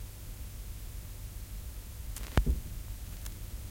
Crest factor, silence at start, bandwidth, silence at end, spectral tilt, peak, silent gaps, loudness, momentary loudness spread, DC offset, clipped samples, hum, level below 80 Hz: 30 dB; 0 s; 17 kHz; 0 s; -5 dB/octave; -8 dBFS; none; -40 LUFS; 12 LU; under 0.1%; under 0.1%; none; -38 dBFS